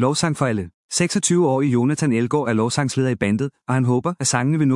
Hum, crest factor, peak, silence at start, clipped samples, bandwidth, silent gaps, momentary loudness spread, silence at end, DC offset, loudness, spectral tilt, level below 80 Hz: none; 18 dB; -2 dBFS; 0 s; under 0.1%; 12 kHz; 0.74-0.89 s; 5 LU; 0 s; under 0.1%; -20 LUFS; -5 dB/octave; -60 dBFS